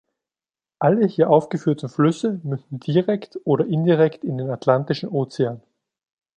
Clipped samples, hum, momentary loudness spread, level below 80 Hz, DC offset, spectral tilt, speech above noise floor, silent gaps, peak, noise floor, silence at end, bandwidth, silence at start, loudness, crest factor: under 0.1%; none; 9 LU; -66 dBFS; under 0.1%; -8 dB/octave; over 70 dB; none; -2 dBFS; under -90 dBFS; 0.8 s; 9.4 kHz; 0.8 s; -21 LUFS; 20 dB